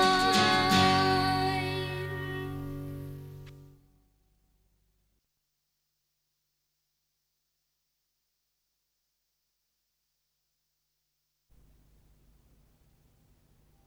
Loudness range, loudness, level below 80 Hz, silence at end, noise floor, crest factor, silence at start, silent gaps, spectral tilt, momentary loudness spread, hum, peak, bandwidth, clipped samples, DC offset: 22 LU; -27 LUFS; -56 dBFS; 10.25 s; -81 dBFS; 24 dB; 0 s; none; -4 dB/octave; 20 LU; 50 Hz at -70 dBFS; -10 dBFS; 16.5 kHz; under 0.1%; under 0.1%